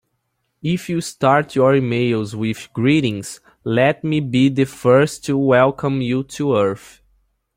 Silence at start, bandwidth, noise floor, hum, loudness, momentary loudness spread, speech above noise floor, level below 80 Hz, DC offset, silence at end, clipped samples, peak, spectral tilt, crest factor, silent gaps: 0.65 s; 16 kHz; -71 dBFS; none; -18 LUFS; 9 LU; 54 dB; -54 dBFS; under 0.1%; 0.8 s; under 0.1%; -2 dBFS; -6.5 dB/octave; 16 dB; none